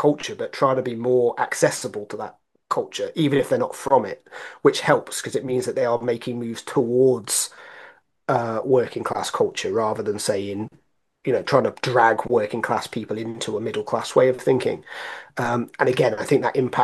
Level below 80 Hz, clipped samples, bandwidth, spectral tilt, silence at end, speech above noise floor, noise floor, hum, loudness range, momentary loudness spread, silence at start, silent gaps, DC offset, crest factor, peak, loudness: -64 dBFS; under 0.1%; 12.5 kHz; -4.5 dB/octave; 0 s; 26 dB; -48 dBFS; none; 2 LU; 13 LU; 0 s; none; under 0.1%; 20 dB; -2 dBFS; -22 LUFS